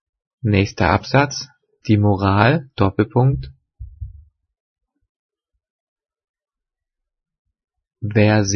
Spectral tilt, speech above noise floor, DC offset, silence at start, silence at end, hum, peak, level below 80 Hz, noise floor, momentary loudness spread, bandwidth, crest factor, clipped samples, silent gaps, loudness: -6 dB/octave; 69 dB; under 0.1%; 0.45 s; 0 s; none; 0 dBFS; -44 dBFS; -85 dBFS; 21 LU; 6.6 kHz; 20 dB; under 0.1%; 4.60-4.76 s, 5.09-5.29 s, 5.70-5.96 s, 6.29-6.34 s, 7.39-7.45 s; -18 LUFS